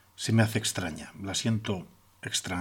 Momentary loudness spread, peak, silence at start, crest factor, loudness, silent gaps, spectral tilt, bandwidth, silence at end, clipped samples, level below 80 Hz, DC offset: 12 LU; -10 dBFS; 0.2 s; 20 dB; -30 LUFS; none; -4 dB/octave; 17 kHz; 0 s; under 0.1%; -60 dBFS; under 0.1%